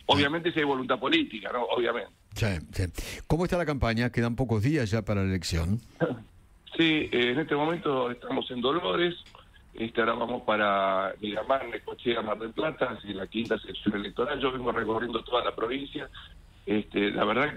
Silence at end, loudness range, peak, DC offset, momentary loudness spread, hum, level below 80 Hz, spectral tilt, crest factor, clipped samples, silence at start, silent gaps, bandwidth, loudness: 0 s; 3 LU; -10 dBFS; under 0.1%; 9 LU; none; -48 dBFS; -6 dB/octave; 20 dB; under 0.1%; 0 s; none; 16 kHz; -28 LUFS